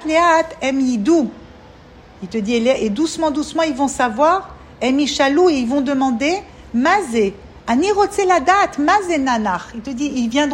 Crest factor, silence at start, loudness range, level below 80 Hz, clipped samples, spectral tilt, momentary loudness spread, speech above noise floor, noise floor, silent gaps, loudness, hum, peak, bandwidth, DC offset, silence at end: 16 dB; 0 s; 3 LU; -46 dBFS; under 0.1%; -4 dB/octave; 10 LU; 26 dB; -42 dBFS; none; -17 LUFS; none; -2 dBFS; 16 kHz; under 0.1%; 0 s